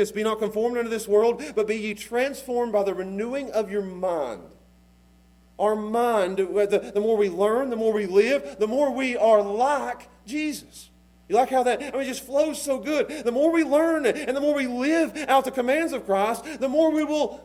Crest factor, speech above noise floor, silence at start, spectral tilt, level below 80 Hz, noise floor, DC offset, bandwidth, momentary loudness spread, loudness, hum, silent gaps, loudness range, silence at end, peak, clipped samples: 18 dB; 32 dB; 0 s; -4.5 dB/octave; -58 dBFS; -56 dBFS; under 0.1%; 16 kHz; 8 LU; -24 LUFS; none; none; 5 LU; 0.05 s; -6 dBFS; under 0.1%